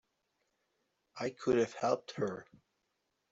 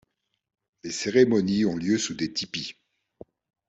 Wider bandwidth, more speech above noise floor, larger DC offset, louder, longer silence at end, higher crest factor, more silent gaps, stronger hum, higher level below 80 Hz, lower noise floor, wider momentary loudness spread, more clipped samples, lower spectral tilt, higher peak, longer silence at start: about the same, 7.8 kHz vs 8.2 kHz; first, 48 dB vs 27 dB; neither; second, -35 LUFS vs -25 LUFS; about the same, 0.9 s vs 0.95 s; about the same, 20 dB vs 20 dB; neither; neither; second, -74 dBFS vs -64 dBFS; first, -83 dBFS vs -51 dBFS; about the same, 13 LU vs 14 LU; neither; about the same, -5.5 dB/octave vs -4.5 dB/octave; second, -18 dBFS vs -6 dBFS; first, 1.15 s vs 0.85 s